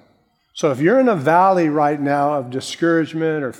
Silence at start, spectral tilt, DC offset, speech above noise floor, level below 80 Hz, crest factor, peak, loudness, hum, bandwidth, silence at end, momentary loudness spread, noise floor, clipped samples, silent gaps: 0.55 s; -6 dB/octave; under 0.1%; 43 dB; -68 dBFS; 16 dB; -2 dBFS; -17 LUFS; none; 14.5 kHz; 0.05 s; 8 LU; -60 dBFS; under 0.1%; none